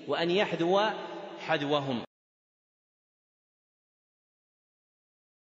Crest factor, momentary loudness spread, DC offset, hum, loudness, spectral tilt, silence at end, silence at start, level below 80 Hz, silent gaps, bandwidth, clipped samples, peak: 20 dB; 13 LU; under 0.1%; none; -29 LUFS; -3 dB/octave; 3.4 s; 0 s; -82 dBFS; none; 7.6 kHz; under 0.1%; -12 dBFS